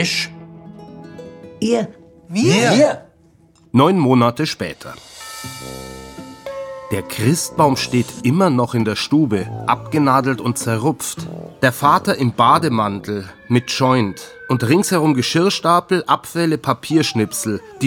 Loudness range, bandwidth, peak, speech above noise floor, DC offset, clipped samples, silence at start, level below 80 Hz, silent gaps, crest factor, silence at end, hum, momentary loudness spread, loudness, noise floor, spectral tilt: 4 LU; 18 kHz; -2 dBFS; 35 dB; under 0.1%; under 0.1%; 0 s; -54 dBFS; none; 16 dB; 0 s; none; 19 LU; -17 LUFS; -52 dBFS; -5 dB/octave